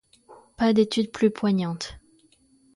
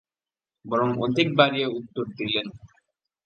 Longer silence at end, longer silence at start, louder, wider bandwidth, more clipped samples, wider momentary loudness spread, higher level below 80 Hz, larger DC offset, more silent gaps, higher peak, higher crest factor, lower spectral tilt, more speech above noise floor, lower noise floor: first, 0.8 s vs 0.6 s; second, 0.3 s vs 0.65 s; about the same, -24 LUFS vs -24 LUFS; first, 11.5 kHz vs 8.6 kHz; neither; about the same, 11 LU vs 12 LU; first, -56 dBFS vs -64 dBFS; neither; neither; second, -8 dBFS vs -2 dBFS; second, 18 dB vs 24 dB; about the same, -6 dB/octave vs -6.5 dB/octave; second, 38 dB vs over 66 dB; second, -60 dBFS vs under -90 dBFS